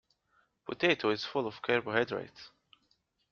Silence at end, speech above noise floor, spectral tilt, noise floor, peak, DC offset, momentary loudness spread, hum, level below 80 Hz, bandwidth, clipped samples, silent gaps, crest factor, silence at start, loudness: 0.85 s; 43 dB; -2.5 dB/octave; -75 dBFS; -12 dBFS; under 0.1%; 20 LU; none; -72 dBFS; 7 kHz; under 0.1%; none; 24 dB; 0.7 s; -31 LUFS